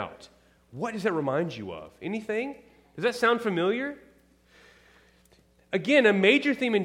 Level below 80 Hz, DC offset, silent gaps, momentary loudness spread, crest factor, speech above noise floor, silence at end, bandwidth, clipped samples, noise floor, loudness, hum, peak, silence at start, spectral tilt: -68 dBFS; under 0.1%; none; 18 LU; 22 dB; 35 dB; 0 s; 14.5 kHz; under 0.1%; -61 dBFS; -26 LUFS; none; -6 dBFS; 0 s; -5.5 dB/octave